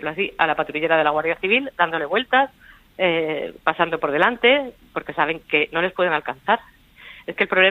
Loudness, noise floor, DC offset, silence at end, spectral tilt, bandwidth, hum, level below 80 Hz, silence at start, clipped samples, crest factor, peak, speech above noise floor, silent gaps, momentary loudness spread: -20 LUFS; -45 dBFS; under 0.1%; 0 s; -6 dB/octave; 15 kHz; none; -56 dBFS; 0 s; under 0.1%; 18 dB; -2 dBFS; 24 dB; none; 8 LU